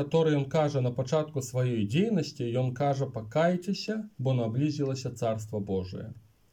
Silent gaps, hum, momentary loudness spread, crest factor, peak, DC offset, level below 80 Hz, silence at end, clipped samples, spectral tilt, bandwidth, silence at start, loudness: none; none; 7 LU; 16 dB; -14 dBFS; under 0.1%; -66 dBFS; 0.35 s; under 0.1%; -7 dB/octave; 15.5 kHz; 0 s; -29 LUFS